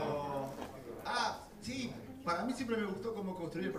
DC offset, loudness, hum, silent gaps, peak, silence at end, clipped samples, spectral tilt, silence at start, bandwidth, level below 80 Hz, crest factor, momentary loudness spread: under 0.1%; -39 LUFS; none; none; -22 dBFS; 0 s; under 0.1%; -5 dB/octave; 0 s; 15.5 kHz; -64 dBFS; 16 dB; 9 LU